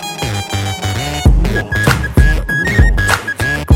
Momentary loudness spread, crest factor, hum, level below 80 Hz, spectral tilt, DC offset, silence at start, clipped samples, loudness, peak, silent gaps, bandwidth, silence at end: 7 LU; 12 dB; none; -16 dBFS; -5 dB/octave; under 0.1%; 0 s; under 0.1%; -14 LUFS; 0 dBFS; none; 16.5 kHz; 0 s